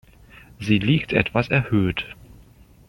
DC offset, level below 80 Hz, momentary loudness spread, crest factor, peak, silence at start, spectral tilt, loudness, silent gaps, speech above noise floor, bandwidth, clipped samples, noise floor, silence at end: under 0.1%; -46 dBFS; 11 LU; 20 dB; -2 dBFS; 0.6 s; -7.5 dB/octave; -21 LUFS; none; 29 dB; 16.5 kHz; under 0.1%; -50 dBFS; 0.75 s